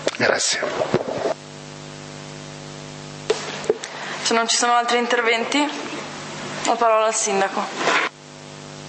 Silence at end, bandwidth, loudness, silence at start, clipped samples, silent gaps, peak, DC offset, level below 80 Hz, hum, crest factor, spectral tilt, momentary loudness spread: 0 s; 8.8 kHz; -21 LUFS; 0 s; under 0.1%; none; 0 dBFS; under 0.1%; -62 dBFS; none; 22 dB; -2 dB/octave; 18 LU